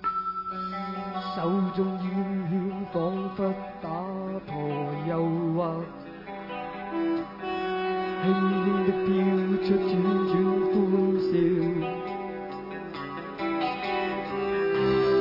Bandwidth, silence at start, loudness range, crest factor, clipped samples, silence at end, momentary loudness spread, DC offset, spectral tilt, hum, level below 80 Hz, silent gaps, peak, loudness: 5.8 kHz; 0 s; 6 LU; 16 dB; under 0.1%; 0 s; 11 LU; under 0.1%; -9.5 dB/octave; none; -58 dBFS; none; -12 dBFS; -28 LUFS